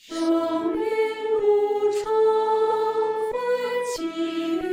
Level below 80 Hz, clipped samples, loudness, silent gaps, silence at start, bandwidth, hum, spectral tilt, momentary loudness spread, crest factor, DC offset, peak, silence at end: -60 dBFS; under 0.1%; -23 LUFS; none; 0.1 s; 16 kHz; none; -4 dB/octave; 6 LU; 12 dB; under 0.1%; -10 dBFS; 0 s